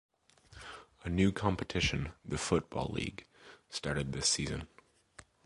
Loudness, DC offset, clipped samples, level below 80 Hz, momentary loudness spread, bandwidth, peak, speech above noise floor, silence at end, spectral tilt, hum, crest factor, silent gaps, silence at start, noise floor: -34 LUFS; under 0.1%; under 0.1%; -50 dBFS; 19 LU; 11.5 kHz; -14 dBFS; 26 dB; 0.25 s; -4 dB/octave; none; 22 dB; none; 0.5 s; -60 dBFS